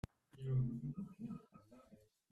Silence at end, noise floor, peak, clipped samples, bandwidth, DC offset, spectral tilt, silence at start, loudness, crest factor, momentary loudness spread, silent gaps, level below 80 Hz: 0.35 s; -68 dBFS; -28 dBFS; under 0.1%; 4.7 kHz; under 0.1%; -10 dB/octave; 0.35 s; -44 LUFS; 16 dB; 25 LU; none; -64 dBFS